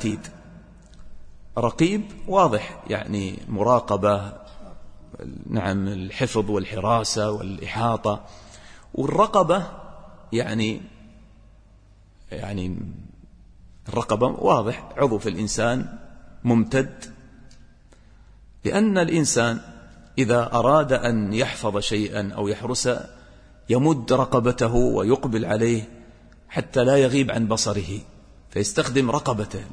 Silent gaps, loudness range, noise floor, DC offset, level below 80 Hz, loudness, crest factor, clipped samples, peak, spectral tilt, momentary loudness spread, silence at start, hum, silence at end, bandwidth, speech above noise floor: none; 5 LU; -52 dBFS; under 0.1%; -44 dBFS; -23 LUFS; 20 dB; under 0.1%; -4 dBFS; -5.5 dB/octave; 15 LU; 0 s; none; 0 s; 10.5 kHz; 30 dB